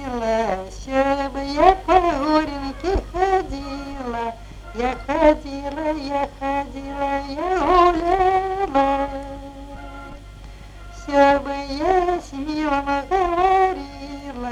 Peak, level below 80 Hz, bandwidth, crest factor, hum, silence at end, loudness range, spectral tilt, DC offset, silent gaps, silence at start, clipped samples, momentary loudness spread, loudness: 0 dBFS; -36 dBFS; 12 kHz; 20 dB; 50 Hz at -40 dBFS; 0 s; 3 LU; -5.5 dB/octave; under 0.1%; none; 0 s; under 0.1%; 20 LU; -21 LUFS